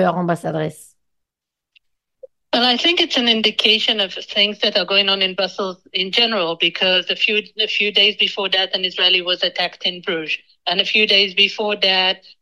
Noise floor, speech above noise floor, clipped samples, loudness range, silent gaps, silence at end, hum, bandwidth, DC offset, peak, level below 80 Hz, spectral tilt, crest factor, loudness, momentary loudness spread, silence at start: -84 dBFS; 65 dB; under 0.1%; 2 LU; none; 0.25 s; none; 12.5 kHz; under 0.1%; 0 dBFS; -68 dBFS; -3.5 dB/octave; 18 dB; -16 LUFS; 9 LU; 0 s